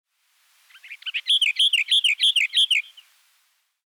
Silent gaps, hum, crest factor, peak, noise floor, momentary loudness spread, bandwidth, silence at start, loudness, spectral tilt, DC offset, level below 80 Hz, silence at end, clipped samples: none; none; 12 dB; -12 dBFS; -67 dBFS; 11 LU; 19 kHz; 0.85 s; -18 LUFS; 13 dB/octave; under 0.1%; under -90 dBFS; 1.05 s; under 0.1%